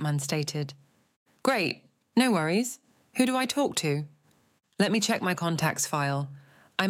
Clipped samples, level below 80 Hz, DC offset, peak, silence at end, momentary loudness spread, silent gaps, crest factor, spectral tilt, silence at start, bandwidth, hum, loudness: under 0.1%; -74 dBFS; under 0.1%; -8 dBFS; 0 s; 11 LU; 1.16-1.26 s; 20 dB; -4.5 dB/octave; 0 s; 16.5 kHz; none; -28 LUFS